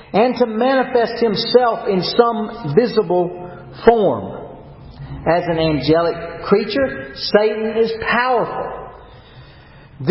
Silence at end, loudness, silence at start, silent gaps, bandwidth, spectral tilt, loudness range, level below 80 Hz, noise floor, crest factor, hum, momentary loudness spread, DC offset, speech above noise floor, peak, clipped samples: 0 s; -17 LUFS; 0 s; none; 5.8 kHz; -9.5 dB/octave; 3 LU; -44 dBFS; -42 dBFS; 18 dB; none; 15 LU; under 0.1%; 26 dB; 0 dBFS; under 0.1%